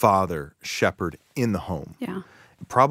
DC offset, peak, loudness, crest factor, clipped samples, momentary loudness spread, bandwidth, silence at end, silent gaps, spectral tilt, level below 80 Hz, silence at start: under 0.1%; -4 dBFS; -26 LUFS; 22 dB; under 0.1%; 12 LU; 16 kHz; 0 s; none; -5.5 dB/octave; -52 dBFS; 0 s